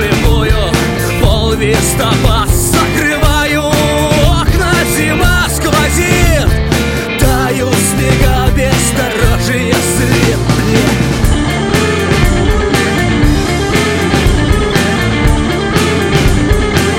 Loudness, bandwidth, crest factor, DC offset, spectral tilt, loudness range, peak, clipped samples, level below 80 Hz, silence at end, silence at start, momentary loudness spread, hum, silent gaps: -11 LUFS; 17 kHz; 10 dB; under 0.1%; -4.5 dB/octave; 1 LU; 0 dBFS; under 0.1%; -16 dBFS; 0 s; 0 s; 2 LU; none; none